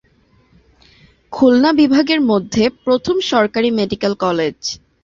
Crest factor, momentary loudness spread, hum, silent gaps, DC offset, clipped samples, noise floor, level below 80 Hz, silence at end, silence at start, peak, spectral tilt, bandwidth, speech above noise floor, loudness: 14 dB; 8 LU; none; none; under 0.1%; under 0.1%; -55 dBFS; -50 dBFS; 0.25 s; 1.3 s; -2 dBFS; -5 dB/octave; 7.6 kHz; 40 dB; -15 LUFS